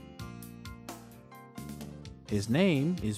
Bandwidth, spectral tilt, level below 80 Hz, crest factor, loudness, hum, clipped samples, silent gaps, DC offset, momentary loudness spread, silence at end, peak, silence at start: 16 kHz; -6.5 dB/octave; -56 dBFS; 18 dB; -30 LUFS; none; under 0.1%; none; under 0.1%; 21 LU; 0 s; -16 dBFS; 0 s